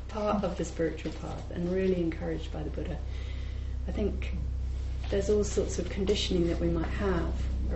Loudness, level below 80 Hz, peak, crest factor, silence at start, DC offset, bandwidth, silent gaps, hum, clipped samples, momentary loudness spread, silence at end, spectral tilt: -32 LUFS; -34 dBFS; -16 dBFS; 16 dB; 0 s; under 0.1%; 8.2 kHz; none; none; under 0.1%; 9 LU; 0 s; -6 dB/octave